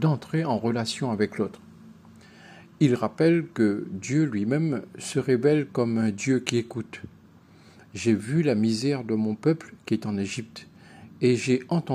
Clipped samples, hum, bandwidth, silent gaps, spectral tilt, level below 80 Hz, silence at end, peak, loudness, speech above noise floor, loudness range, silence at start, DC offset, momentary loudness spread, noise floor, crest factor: under 0.1%; none; 13 kHz; none; -6.5 dB/octave; -70 dBFS; 0 s; -4 dBFS; -26 LUFS; 28 dB; 3 LU; 0 s; under 0.1%; 10 LU; -53 dBFS; 22 dB